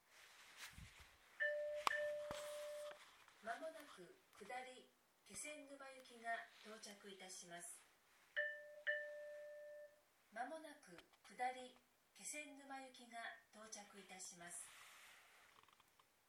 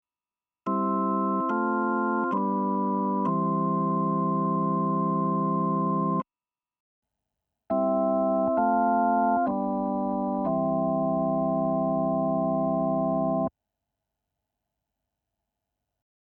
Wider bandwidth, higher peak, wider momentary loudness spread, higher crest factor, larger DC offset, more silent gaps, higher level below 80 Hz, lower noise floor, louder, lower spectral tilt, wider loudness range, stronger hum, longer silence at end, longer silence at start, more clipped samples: first, 19 kHz vs 3.3 kHz; second, -20 dBFS vs -14 dBFS; first, 18 LU vs 4 LU; first, 34 dB vs 14 dB; neither; second, none vs 6.80-7.02 s; second, -82 dBFS vs -62 dBFS; second, -76 dBFS vs under -90 dBFS; second, -51 LUFS vs -26 LUFS; second, -1.5 dB/octave vs -12.5 dB/octave; first, 7 LU vs 4 LU; neither; second, 0.25 s vs 2.9 s; second, 0.05 s vs 0.65 s; neither